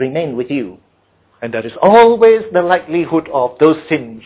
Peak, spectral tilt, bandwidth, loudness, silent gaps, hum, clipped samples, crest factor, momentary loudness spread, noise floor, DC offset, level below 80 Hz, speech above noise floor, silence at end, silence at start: 0 dBFS; -10 dB/octave; 4 kHz; -13 LUFS; none; none; under 0.1%; 14 dB; 15 LU; -56 dBFS; under 0.1%; -54 dBFS; 43 dB; 0.05 s; 0 s